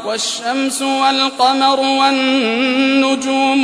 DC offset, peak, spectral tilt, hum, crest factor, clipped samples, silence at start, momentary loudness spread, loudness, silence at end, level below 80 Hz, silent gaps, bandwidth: under 0.1%; -2 dBFS; -1.5 dB/octave; none; 12 dB; under 0.1%; 0 s; 5 LU; -14 LUFS; 0 s; -66 dBFS; none; 11 kHz